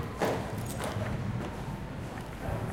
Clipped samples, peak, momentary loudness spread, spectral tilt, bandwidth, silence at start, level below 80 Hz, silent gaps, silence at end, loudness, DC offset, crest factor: under 0.1%; -18 dBFS; 7 LU; -6 dB/octave; 17 kHz; 0 s; -46 dBFS; none; 0 s; -35 LUFS; under 0.1%; 18 dB